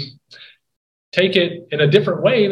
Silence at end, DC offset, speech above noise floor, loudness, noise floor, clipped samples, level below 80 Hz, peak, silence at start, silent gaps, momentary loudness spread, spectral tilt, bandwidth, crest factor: 0 s; under 0.1%; 29 dB; -17 LUFS; -45 dBFS; under 0.1%; -60 dBFS; 0 dBFS; 0 s; 0.76-1.12 s; 8 LU; -7 dB/octave; 9.4 kHz; 18 dB